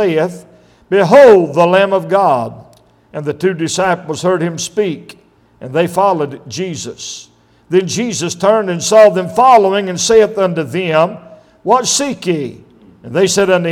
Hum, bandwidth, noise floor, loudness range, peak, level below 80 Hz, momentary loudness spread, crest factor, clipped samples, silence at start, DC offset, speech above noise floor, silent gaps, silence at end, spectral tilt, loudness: none; 16.5 kHz; -46 dBFS; 7 LU; 0 dBFS; -54 dBFS; 16 LU; 12 dB; 0.1%; 0 s; under 0.1%; 34 dB; none; 0 s; -4.5 dB/octave; -12 LUFS